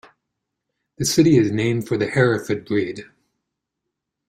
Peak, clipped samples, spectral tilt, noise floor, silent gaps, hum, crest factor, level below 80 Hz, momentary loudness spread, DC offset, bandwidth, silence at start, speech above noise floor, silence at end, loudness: -4 dBFS; under 0.1%; -5.5 dB/octave; -81 dBFS; none; none; 18 dB; -54 dBFS; 10 LU; under 0.1%; 16 kHz; 1 s; 62 dB; 1.25 s; -19 LUFS